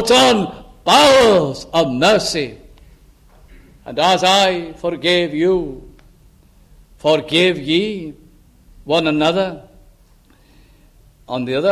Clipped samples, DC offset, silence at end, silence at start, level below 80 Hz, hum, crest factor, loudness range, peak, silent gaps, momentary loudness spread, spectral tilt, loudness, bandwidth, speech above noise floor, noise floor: under 0.1%; under 0.1%; 0 s; 0 s; -46 dBFS; none; 16 dB; 6 LU; 0 dBFS; none; 15 LU; -4 dB/octave; -15 LUFS; 15.5 kHz; 35 dB; -50 dBFS